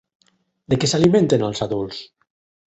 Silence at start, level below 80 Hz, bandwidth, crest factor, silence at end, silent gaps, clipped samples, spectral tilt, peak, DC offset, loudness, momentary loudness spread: 0.7 s; -52 dBFS; 8.4 kHz; 18 dB; 0.65 s; none; under 0.1%; -5.5 dB/octave; -2 dBFS; under 0.1%; -19 LUFS; 13 LU